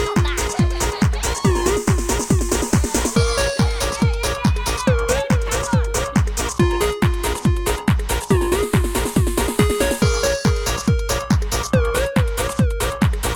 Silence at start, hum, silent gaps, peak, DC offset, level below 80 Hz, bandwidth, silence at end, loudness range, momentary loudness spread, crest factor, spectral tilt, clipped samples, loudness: 0 s; none; none; -2 dBFS; under 0.1%; -24 dBFS; 19 kHz; 0 s; 1 LU; 2 LU; 16 dB; -5 dB/octave; under 0.1%; -19 LUFS